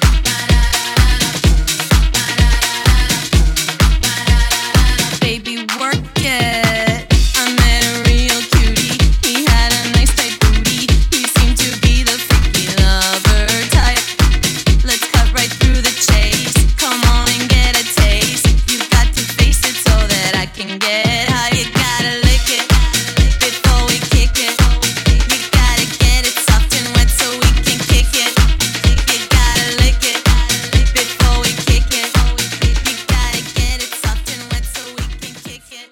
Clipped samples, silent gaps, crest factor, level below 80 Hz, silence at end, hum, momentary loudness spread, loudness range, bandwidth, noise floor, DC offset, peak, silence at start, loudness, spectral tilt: under 0.1%; none; 12 dB; -16 dBFS; 0.05 s; none; 5 LU; 2 LU; 17.5 kHz; -33 dBFS; under 0.1%; 0 dBFS; 0 s; -13 LUFS; -3.5 dB/octave